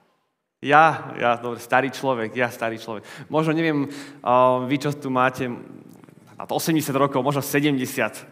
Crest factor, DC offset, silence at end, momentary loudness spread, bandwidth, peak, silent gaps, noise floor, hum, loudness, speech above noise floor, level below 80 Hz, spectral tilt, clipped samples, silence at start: 22 dB; under 0.1%; 0.05 s; 13 LU; 16 kHz; 0 dBFS; none; -72 dBFS; none; -22 LUFS; 50 dB; -74 dBFS; -5 dB/octave; under 0.1%; 0.6 s